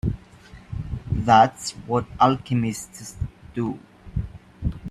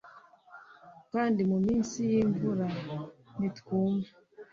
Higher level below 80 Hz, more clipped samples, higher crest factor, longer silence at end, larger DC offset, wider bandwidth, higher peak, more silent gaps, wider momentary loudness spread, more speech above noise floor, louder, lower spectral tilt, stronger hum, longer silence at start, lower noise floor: first, -40 dBFS vs -62 dBFS; neither; first, 22 dB vs 14 dB; about the same, 0 s vs 0.1 s; neither; first, 13.5 kHz vs 7.6 kHz; first, -2 dBFS vs -16 dBFS; neither; first, 19 LU vs 13 LU; about the same, 25 dB vs 26 dB; first, -23 LUFS vs -30 LUFS; about the same, -6 dB/octave vs -7 dB/octave; neither; about the same, 0.05 s vs 0.05 s; second, -46 dBFS vs -55 dBFS